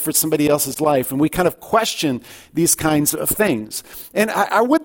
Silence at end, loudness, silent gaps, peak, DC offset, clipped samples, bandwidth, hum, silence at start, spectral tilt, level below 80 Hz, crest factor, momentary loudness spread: 0 s; -18 LUFS; none; -2 dBFS; under 0.1%; under 0.1%; 17 kHz; none; 0 s; -3.5 dB/octave; -46 dBFS; 16 dB; 9 LU